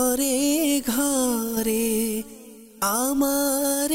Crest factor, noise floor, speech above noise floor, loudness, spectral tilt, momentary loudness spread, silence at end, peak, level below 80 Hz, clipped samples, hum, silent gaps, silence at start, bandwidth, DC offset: 12 dB; -44 dBFS; 22 dB; -22 LUFS; -2.5 dB/octave; 5 LU; 0 s; -12 dBFS; -52 dBFS; under 0.1%; none; none; 0 s; 16 kHz; under 0.1%